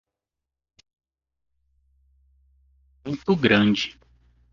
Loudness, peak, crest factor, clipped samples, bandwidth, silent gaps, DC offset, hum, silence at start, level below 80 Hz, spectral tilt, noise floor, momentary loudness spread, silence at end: -22 LUFS; -2 dBFS; 26 dB; under 0.1%; 7.2 kHz; none; under 0.1%; none; 3.05 s; -58 dBFS; -6 dB/octave; -87 dBFS; 15 LU; 0.6 s